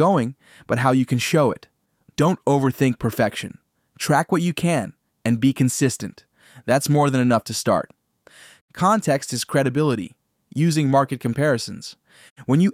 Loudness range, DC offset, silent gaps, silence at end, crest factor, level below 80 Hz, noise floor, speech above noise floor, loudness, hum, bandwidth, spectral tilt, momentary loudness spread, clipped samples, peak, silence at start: 1 LU; under 0.1%; 8.61-8.68 s, 12.31-12.36 s; 0 s; 16 dB; -58 dBFS; -51 dBFS; 31 dB; -21 LUFS; none; 16 kHz; -5.5 dB/octave; 16 LU; under 0.1%; -4 dBFS; 0 s